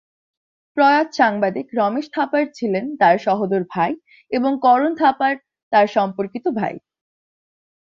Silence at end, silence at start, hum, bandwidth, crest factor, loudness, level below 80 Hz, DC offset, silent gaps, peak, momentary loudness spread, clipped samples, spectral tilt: 1.05 s; 0.75 s; none; 7.2 kHz; 18 dB; -19 LUFS; -66 dBFS; under 0.1%; 5.63-5.71 s; -2 dBFS; 9 LU; under 0.1%; -6.5 dB/octave